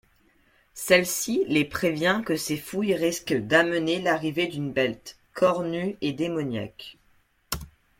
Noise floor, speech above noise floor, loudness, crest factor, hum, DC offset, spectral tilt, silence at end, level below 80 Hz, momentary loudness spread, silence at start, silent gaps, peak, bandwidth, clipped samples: -64 dBFS; 39 dB; -25 LUFS; 22 dB; none; under 0.1%; -4 dB/octave; 0.35 s; -56 dBFS; 14 LU; 0.75 s; none; -4 dBFS; 16.5 kHz; under 0.1%